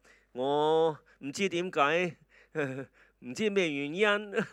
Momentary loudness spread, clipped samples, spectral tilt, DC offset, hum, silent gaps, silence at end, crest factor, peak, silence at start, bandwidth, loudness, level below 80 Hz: 16 LU; under 0.1%; -4.5 dB/octave; under 0.1%; none; none; 0 s; 20 dB; -10 dBFS; 0.35 s; 12 kHz; -30 LUFS; -74 dBFS